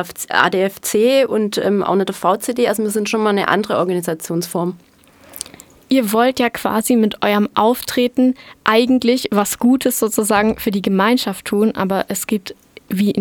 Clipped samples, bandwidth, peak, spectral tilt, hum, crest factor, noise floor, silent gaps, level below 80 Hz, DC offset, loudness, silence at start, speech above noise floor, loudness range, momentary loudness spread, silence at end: under 0.1%; 20 kHz; 0 dBFS; -4.5 dB/octave; none; 16 dB; -42 dBFS; none; -54 dBFS; under 0.1%; -17 LUFS; 0 s; 26 dB; 4 LU; 7 LU; 0 s